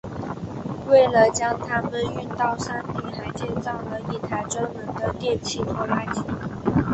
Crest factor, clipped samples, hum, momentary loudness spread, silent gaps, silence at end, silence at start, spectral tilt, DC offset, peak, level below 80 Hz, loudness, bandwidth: 20 dB; under 0.1%; none; 13 LU; none; 0 s; 0.05 s; -5.5 dB/octave; under 0.1%; -4 dBFS; -46 dBFS; -24 LUFS; 8.4 kHz